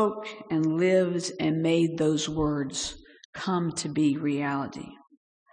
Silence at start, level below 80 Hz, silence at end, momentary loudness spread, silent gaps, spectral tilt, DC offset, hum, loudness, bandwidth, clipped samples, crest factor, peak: 0 s; -54 dBFS; 0.55 s; 14 LU; 3.25-3.33 s; -5.5 dB/octave; under 0.1%; none; -27 LUFS; 10 kHz; under 0.1%; 14 dB; -12 dBFS